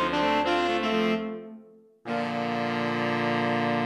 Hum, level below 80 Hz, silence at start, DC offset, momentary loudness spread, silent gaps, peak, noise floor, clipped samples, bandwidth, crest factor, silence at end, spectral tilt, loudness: none; -58 dBFS; 0 s; under 0.1%; 11 LU; none; -14 dBFS; -52 dBFS; under 0.1%; 12.5 kHz; 14 dB; 0 s; -5.5 dB/octave; -27 LUFS